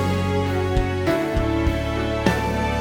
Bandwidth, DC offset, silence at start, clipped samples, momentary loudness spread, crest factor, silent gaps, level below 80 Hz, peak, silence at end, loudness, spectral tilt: 18.5 kHz; under 0.1%; 0 s; under 0.1%; 2 LU; 16 dB; none; -30 dBFS; -4 dBFS; 0 s; -22 LUFS; -6.5 dB/octave